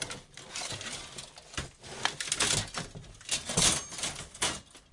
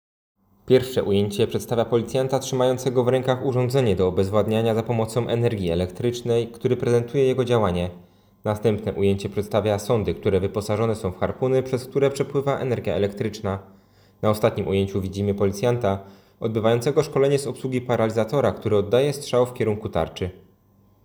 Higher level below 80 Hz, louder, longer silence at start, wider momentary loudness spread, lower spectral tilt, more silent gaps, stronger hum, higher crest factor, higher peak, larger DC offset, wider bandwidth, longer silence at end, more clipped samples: about the same, -54 dBFS vs -52 dBFS; second, -31 LUFS vs -23 LUFS; second, 0 s vs 0.65 s; first, 18 LU vs 6 LU; second, -1 dB/octave vs -6.5 dB/octave; neither; neither; first, 26 dB vs 18 dB; second, -8 dBFS vs -4 dBFS; neither; second, 11.5 kHz vs over 20 kHz; second, 0.1 s vs 0.65 s; neither